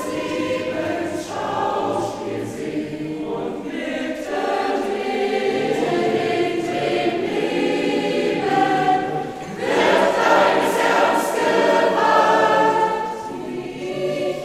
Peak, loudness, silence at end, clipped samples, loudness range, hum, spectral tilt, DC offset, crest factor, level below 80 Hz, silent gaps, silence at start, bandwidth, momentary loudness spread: -4 dBFS; -20 LUFS; 0 s; under 0.1%; 8 LU; none; -4.5 dB/octave; under 0.1%; 16 dB; -56 dBFS; none; 0 s; 16 kHz; 11 LU